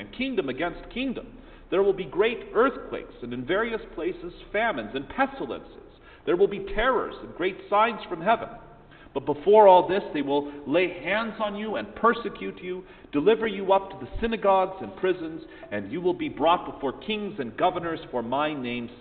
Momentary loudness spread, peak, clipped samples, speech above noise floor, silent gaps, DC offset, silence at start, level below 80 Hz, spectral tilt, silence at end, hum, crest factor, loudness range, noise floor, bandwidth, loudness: 13 LU; -4 dBFS; under 0.1%; 24 dB; none; under 0.1%; 0 s; -48 dBFS; -3 dB/octave; 0 s; none; 22 dB; 6 LU; -49 dBFS; 4.6 kHz; -26 LUFS